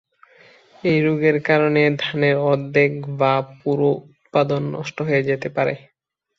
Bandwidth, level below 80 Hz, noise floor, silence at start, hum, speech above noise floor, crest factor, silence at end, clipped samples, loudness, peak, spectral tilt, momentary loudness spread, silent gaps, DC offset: 7.2 kHz; -62 dBFS; -51 dBFS; 0.85 s; none; 32 dB; 18 dB; 0.6 s; under 0.1%; -20 LUFS; -2 dBFS; -7.5 dB/octave; 7 LU; none; under 0.1%